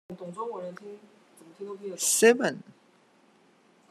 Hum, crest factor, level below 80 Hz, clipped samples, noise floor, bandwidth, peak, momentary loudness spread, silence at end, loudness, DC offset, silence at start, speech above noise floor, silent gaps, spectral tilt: none; 24 dB; -82 dBFS; under 0.1%; -62 dBFS; 13.5 kHz; -6 dBFS; 24 LU; 1.3 s; -25 LUFS; under 0.1%; 0.1 s; 34 dB; none; -2.5 dB/octave